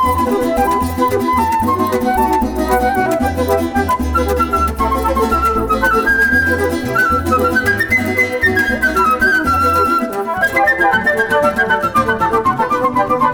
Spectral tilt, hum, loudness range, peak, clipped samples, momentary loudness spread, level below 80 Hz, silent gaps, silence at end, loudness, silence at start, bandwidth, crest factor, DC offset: -5.5 dB/octave; none; 2 LU; -2 dBFS; under 0.1%; 4 LU; -30 dBFS; none; 0 s; -14 LUFS; 0 s; over 20 kHz; 12 dB; under 0.1%